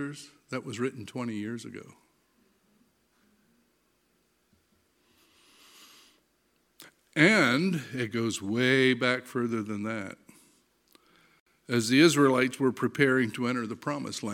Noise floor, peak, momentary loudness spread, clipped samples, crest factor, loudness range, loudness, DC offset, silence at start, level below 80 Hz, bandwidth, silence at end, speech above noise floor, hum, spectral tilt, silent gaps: -71 dBFS; -6 dBFS; 17 LU; under 0.1%; 24 dB; 14 LU; -27 LUFS; under 0.1%; 0 s; -76 dBFS; 16.5 kHz; 0 s; 44 dB; none; -5 dB/octave; 11.40-11.46 s